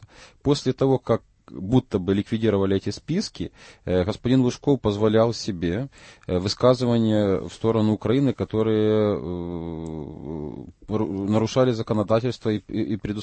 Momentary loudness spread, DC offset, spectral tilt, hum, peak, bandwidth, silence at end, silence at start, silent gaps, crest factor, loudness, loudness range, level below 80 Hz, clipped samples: 13 LU; under 0.1%; -7 dB/octave; none; -6 dBFS; 8.8 kHz; 0 s; 0 s; none; 18 dB; -23 LUFS; 3 LU; -48 dBFS; under 0.1%